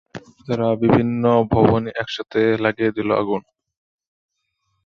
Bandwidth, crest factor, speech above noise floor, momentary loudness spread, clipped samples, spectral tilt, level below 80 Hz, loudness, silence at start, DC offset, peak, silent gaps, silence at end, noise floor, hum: 7 kHz; 20 dB; 54 dB; 10 LU; under 0.1%; -8 dB/octave; -46 dBFS; -19 LUFS; 0.15 s; under 0.1%; 0 dBFS; none; 1.45 s; -72 dBFS; none